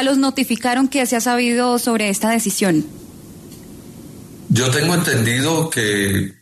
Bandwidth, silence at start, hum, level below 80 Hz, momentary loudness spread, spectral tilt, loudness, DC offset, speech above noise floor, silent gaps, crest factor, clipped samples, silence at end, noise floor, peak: 13.5 kHz; 0 s; none; -52 dBFS; 22 LU; -4 dB/octave; -17 LUFS; under 0.1%; 21 dB; none; 14 dB; under 0.1%; 0.1 s; -38 dBFS; -4 dBFS